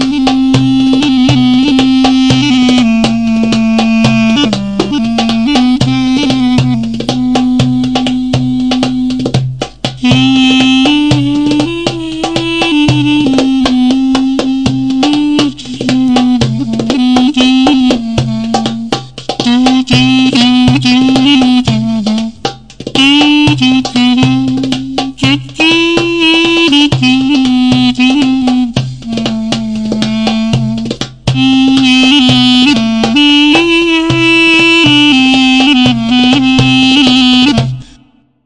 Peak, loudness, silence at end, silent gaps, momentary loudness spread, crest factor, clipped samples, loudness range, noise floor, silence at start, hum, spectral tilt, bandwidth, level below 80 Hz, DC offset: 0 dBFS; -9 LUFS; 0.65 s; none; 9 LU; 8 dB; under 0.1%; 5 LU; -45 dBFS; 0 s; none; -5 dB/octave; 10 kHz; -34 dBFS; 1%